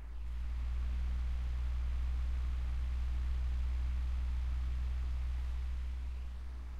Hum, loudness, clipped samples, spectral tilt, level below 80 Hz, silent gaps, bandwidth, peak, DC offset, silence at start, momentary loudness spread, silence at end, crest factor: none; -39 LUFS; under 0.1%; -6.5 dB/octave; -36 dBFS; none; 5.6 kHz; -28 dBFS; under 0.1%; 0 s; 5 LU; 0 s; 8 dB